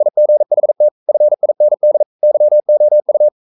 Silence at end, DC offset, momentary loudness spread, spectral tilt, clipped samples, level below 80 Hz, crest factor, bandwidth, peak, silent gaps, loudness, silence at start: 0.15 s; under 0.1%; 3 LU; -11.5 dB/octave; under 0.1%; -80 dBFS; 6 dB; 1.1 kHz; -4 dBFS; 0.91-1.06 s, 2.06-2.19 s; -12 LUFS; 0 s